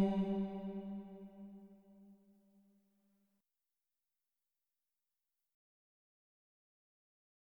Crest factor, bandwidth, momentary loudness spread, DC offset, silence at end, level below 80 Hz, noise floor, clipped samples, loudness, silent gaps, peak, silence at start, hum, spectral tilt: 22 dB; 5 kHz; 26 LU; under 0.1%; 5.25 s; -72 dBFS; under -90 dBFS; under 0.1%; -41 LUFS; none; -24 dBFS; 0 s; none; -9.5 dB/octave